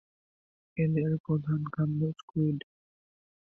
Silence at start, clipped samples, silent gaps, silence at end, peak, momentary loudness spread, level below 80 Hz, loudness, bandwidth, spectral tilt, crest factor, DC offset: 0.75 s; under 0.1%; 1.20-1.24 s, 2.23-2.28 s; 0.8 s; -18 dBFS; 4 LU; -64 dBFS; -31 LUFS; 3.5 kHz; -10.5 dB/octave; 14 dB; under 0.1%